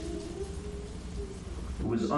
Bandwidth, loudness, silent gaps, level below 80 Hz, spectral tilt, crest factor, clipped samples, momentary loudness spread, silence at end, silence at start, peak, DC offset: 11.5 kHz; -38 LUFS; none; -42 dBFS; -6.5 dB/octave; 18 dB; under 0.1%; 8 LU; 0 s; 0 s; -18 dBFS; under 0.1%